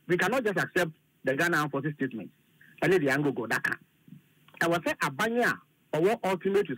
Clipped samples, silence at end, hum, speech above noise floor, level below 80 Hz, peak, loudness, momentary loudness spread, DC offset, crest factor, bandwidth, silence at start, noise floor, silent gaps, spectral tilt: under 0.1%; 0 s; none; 27 dB; -68 dBFS; -14 dBFS; -28 LUFS; 9 LU; under 0.1%; 14 dB; 16 kHz; 0.1 s; -55 dBFS; none; -5 dB/octave